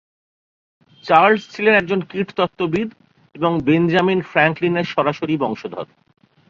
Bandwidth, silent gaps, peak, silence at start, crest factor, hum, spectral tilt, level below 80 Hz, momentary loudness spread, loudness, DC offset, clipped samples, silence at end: 7.4 kHz; none; 0 dBFS; 1.05 s; 20 dB; none; -7 dB/octave; -58 dBFS; 14 LU; -18 LUFS; under 0.1%; under 0.1%; 0.65 s